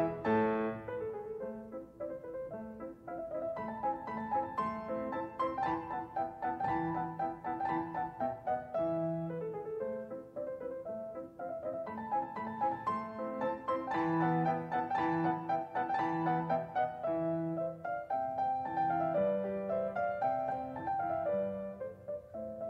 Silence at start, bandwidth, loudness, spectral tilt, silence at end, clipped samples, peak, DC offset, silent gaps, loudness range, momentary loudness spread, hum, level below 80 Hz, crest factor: 0 s; 8.2 kHz; -36 LUFS; -8.5 dB/octave; 0 s; under 0.1%; -20 dBFS; under 0.1%; none; 6 LU; 11 LU; none; -66 dBFS; 16 dB